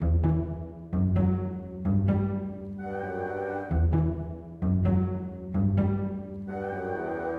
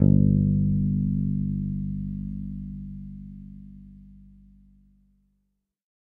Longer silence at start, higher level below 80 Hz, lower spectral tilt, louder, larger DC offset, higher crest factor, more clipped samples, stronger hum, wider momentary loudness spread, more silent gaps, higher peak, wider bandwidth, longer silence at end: about the same, 0 s vs 0 s; about the same, -38 dBFS vs -40 dBFS; second, -11.5 dB/octave vs -14.5 dB/octave; second, -29 LUFS vs -26 LUFS; neither; second, 14 dB vs 22 dB; neither; second, none vs 50 Hz at -60 dBFS; second, 10 LU vs 23 LU; neither; second, -12 dBFS vs -4 dBFS; first, 3.5 kHz vs 1 kHz; second, 0 s vs 1.85 s